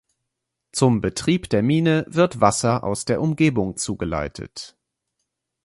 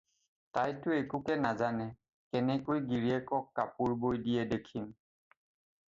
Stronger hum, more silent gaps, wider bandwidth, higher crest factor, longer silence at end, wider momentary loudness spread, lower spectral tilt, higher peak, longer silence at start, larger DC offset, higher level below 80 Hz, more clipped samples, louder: neither; second, none vs 2.13-2.31 s; first, 11.5 kHz vs 7.6 kHz; about the same, 20 dB vs 18 dB; about the same, 1 s vs 1 s; first, 13 LU vs 7 LU; second, -5.5 dB/octave vs -7.5 dB/octave; first, -2 dBFS vs -18 dBFS; first, 0.75 s vs 0.55 s; neither; first, -46 dBFS vs -66 dBFS; neither; first, -21 LUFS vs -34 LUFS